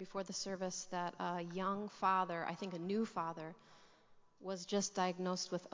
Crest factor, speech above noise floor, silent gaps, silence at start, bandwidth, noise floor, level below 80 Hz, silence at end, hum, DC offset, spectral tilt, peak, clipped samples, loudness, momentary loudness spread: 20 dB; 25 dB; none; 0 s; 7.6 kHz; -66 dBFS; -82 dBFS; 0.05 s; none; under 0.1%; -4 dB/octave; -20 dBFS; under 0.1%; -40 LUFS; 9 LU